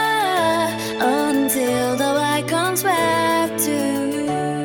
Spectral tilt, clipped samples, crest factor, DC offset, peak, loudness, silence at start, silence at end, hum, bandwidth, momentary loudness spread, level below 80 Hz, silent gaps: -3.5 dB/octave; under 0.1%; 14 dB; under 0.1%; -6 dBFS; -19 LUFS; 0 s; 0 s; none; 19 kHz; 4 LU; -56 dBFS; none